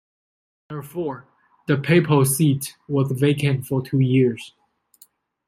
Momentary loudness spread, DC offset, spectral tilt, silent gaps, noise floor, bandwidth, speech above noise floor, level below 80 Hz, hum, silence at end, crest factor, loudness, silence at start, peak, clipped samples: 19 LU; under 0.1%; -6 dB/octave; none; -56 dBFS; 16 kHz; 36 dB; -62 dBFS; none; 1 s; 18 dB; -20 LUFS; 0.7 s; -4 dBFS; under 0.1%